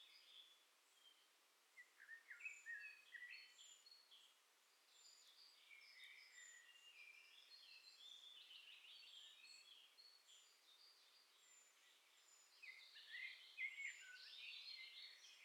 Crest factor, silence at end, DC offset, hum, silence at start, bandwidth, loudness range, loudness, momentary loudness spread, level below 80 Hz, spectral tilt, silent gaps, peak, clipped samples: 22 dB; 0 s; under 0.1%; none; 0 s; 16 kHz; 10 LU; -59 LUFS; 14 LU; under -90 dBFS; 4.5 dB/octave; none; -40 dBFS; under 0.1%